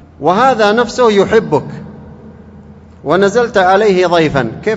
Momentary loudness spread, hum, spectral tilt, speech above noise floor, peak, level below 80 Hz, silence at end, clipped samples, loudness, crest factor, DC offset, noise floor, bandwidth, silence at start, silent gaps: 12 LU; none; -5.5 dB/octave; 25 dB; 0 dBFS; -42 dBFS; 0 s; 0.2%; -11 LUFS; 12 dB; under 0.1%; -36 dBFS; 8.2 kHz; 0.2 s; none